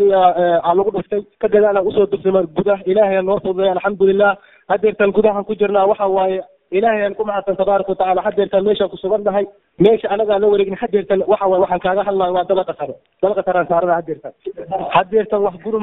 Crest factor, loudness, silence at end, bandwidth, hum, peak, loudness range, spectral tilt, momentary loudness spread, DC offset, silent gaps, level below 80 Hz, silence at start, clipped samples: 16 dB; -16 LUFS; 0 s; 4 kHz; none; 0 dBFS; 2 LU; -9.5 dB/octave; 7 LU; under 0.1%; none; -52 dBFS; 0 s; under 0.1%